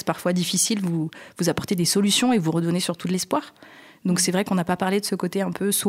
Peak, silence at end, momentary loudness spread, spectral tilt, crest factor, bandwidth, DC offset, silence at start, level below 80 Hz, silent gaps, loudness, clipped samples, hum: -6 dBFS; 0 s; 7 LU; -4 dB/octave; 18 dB; 16 kHz; under 0.1%; 0.05 s; -60 dBFS; none; -23 LUFS; under 0.1%; none